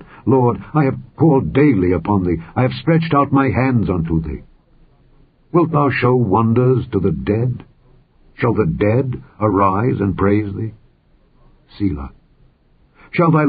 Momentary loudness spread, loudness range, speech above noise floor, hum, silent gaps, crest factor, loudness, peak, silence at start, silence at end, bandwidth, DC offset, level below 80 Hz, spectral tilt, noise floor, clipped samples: 9 LU; 4 LU; 38 dB; none; none; 16 dB; -17 LUFS; -2 dBFS; 0 s; 0 s; 5 kHz; under 0.1%; -36 dBFS; -13.5 dB/octave; -54 dBFS; under 0.1%